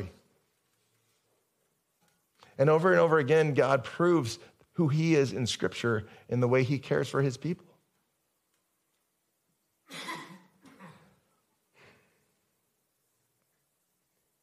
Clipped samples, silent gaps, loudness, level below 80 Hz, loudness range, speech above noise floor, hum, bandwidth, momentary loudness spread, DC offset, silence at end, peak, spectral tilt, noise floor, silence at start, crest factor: under 0.1%; none; -27 LUFS; -74 dBFS; 22 LU; 51 dB; none; 14 kHz; 17 LU; under 0.1%; 3.5 s; -10 dBFS; -6.5 dB/octave; -78 dBFS; 0 s; 22 dB